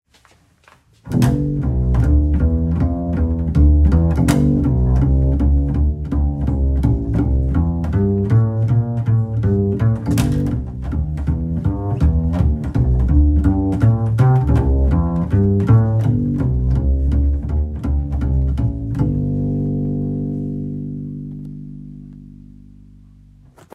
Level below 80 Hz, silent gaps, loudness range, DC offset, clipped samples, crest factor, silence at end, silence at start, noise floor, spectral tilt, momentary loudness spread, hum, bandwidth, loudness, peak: -20 dBFS; none; 6 LU; under 0.1%; under 0.1%; 16 dB; 1.45 s; 1.05 s; -53 dBFS; -9 dB/octave; 8 LU; none; 12 kHz; -18 LUFS; 0 dBFS